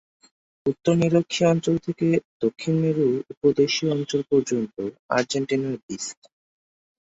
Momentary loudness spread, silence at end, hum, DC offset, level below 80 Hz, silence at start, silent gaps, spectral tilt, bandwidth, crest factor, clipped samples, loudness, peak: 10 LU; 0.95 s; none; under 0.1%; -62 dBFS; 0.65 s; 2.25-2.40 s, 3.37-3.41 s, 4.99-5.09 s, 5.83-5.89 s; -5.5 dB/octave; 8 kHz; 18 dB; under 0.1%; -23 LUFS; -6 dBFS